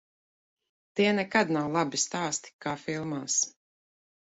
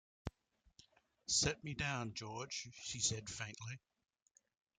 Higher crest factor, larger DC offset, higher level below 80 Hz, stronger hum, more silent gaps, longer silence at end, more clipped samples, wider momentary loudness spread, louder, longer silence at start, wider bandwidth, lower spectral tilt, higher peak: about the same, 22 dB vs 24 dB; neither; second, -70 dBFS vs -64 dBFS; neither; first, 2.53-2.59 s vs none; second, 0.75 s vs 1 s; neither; second, 8 LU vs 18 LU; first, -29 LUFS vs -40 LUFS; first, 0.95 s vs 0.25 s; second, 8.4 kHz vs 11 kHz; about the same, -3 dB/octave vs -2 dB/octave; first, -8 dBFS vs -20 dBFS